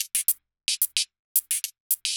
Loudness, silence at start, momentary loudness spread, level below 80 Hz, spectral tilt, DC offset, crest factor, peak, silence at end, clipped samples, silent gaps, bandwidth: -25 LUFS; 0 s; 5 LU; -78 dBFS; 7.5 dB/octave; under 0.1%; 24 dB; -4 dBFS; 0 s; under 0.1%; 1.19-1.35 s, 1.80-1.90 s; over 20 kHz